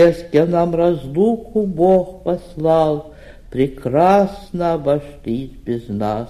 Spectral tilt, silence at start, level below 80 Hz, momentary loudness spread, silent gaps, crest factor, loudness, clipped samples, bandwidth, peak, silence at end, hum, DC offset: -8.5 dB/octave; 0 s; -42 dBFS; 12 LU; none; 14 dB; -18 LUFS; under 0.1%; 13.5 kHz; -2 dBFS; 0 s; none; under 0.1%